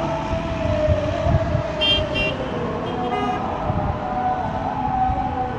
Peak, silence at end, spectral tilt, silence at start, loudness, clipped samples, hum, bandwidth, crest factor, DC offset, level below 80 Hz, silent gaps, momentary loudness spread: -6 dBFS; 0 s; -6.5 dB/octave; 0 s; -22 LUFS; under 0.1%; none; 11 kHz; 16 dB; under 0.1%; -34 dBFS; none; 6 LU